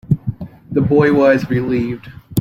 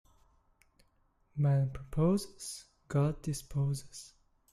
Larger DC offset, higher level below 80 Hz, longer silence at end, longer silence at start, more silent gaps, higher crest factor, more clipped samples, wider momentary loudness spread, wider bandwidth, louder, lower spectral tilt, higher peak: neither; first, -42 dBFS vs -54 dBFS; second, 0 s vs 0.45 s; second, 0.1 s vs 1.35 s; neither; about the same, 14 dB vs 16 dB; neither; about the same, 15 LU vs 17 LU; first, 16 kHz vs 13 kHz; first, -16 LUFS vs -33 LUFS; about the same, -8 dB/octave vs -7 dB/octave; first, -2 dBFS vs -18 dBFS